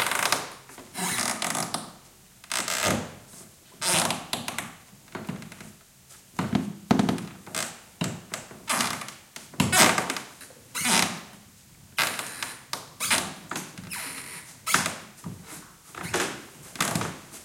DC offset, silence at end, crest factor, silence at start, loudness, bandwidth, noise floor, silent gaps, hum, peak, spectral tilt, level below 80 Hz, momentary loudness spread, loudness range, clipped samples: under 0.1%; 0 s; 26 dB; 0 s; -27 LUFS; 17 kHz; -53 dBFS; none; none; -4 dBFS; -2.5 dB/octave; -62 dBFS; 19 LU; 6 LU; under 0.1%